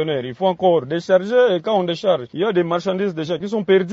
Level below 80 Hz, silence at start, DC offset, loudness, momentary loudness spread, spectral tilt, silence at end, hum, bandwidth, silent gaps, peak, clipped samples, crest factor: -64 dBFS; 0 s; under 0.1%; -19 LUFS; 6 LU; -6.5 dB/octave; 0 s; none; 7.8 kHz; none; -2 dBFS; under 0.1%; 16 dB